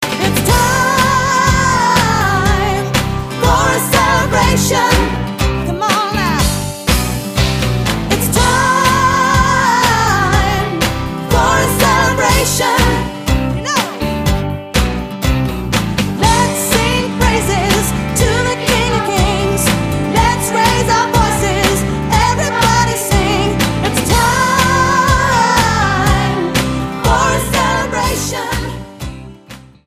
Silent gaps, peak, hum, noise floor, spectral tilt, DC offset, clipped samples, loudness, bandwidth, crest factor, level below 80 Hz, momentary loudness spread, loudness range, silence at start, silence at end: none; 0 dBFS; none; -37 dBFS; -4 dB/octave; under 0.1%; under 0.1%; -13 LUFS; 15.5 kHz; 14 dB; -24 dBFS; 6 LU; 3 LU; 0 s; 0.3 s